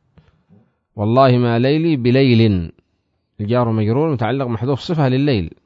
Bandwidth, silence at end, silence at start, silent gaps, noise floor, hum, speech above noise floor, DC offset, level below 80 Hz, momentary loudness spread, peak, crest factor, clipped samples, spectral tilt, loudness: 7.2 kHz; 0.15 s; 0.95 s; none; -68 dBFS; none; 52 dB; under 0.1%; -46 dBFS; 9 LU; 0 dBFS; 16 dB; under 0.1%; -9 dB/octave; -16 LUFS